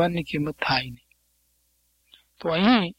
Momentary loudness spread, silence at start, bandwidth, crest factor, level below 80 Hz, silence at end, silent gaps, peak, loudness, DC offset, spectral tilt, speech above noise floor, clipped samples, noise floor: 12 LU; 0 s; 15.5 kHz; 22 dB; -56 dBFS; 0.05 s; none; -4 dBFS; -24 LUFS; under 0.1%; -6.5 dB/octave; 45 dB; under 0.1%; -68 dBFS